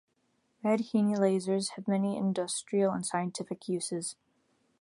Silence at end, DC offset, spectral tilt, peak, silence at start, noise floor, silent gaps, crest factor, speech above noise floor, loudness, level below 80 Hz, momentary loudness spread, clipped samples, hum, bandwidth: 0.7 s; under 0.1%; -5.5 dB/octave; -14 dBFS; 0.65 s; -75 dBFS; none; 18 dB; 44 dB; -31 LUFS; -76 dBFS; 8 LU; under 0.1%; none; 11.5 kHz